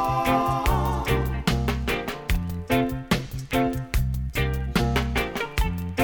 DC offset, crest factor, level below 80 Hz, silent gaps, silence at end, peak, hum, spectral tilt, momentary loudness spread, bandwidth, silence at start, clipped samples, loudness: under 0.1%; 18 dB; -30 dBFS; none; 0 s; -6 dBFS; none; -5.5 dB/octave; 5 LU; 19 kHz; 0 s; under 0.1%; -25 LUFS